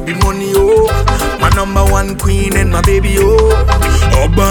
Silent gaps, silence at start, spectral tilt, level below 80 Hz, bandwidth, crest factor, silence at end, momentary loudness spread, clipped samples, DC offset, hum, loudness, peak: none; 0 s; -5.5 dB/octave; -14 dBFS; 19.5 kHz; 10 dB; 0 s; 5 LU; under 0.1%; under 0.1%; none; -11 LUFS; 0 dBFS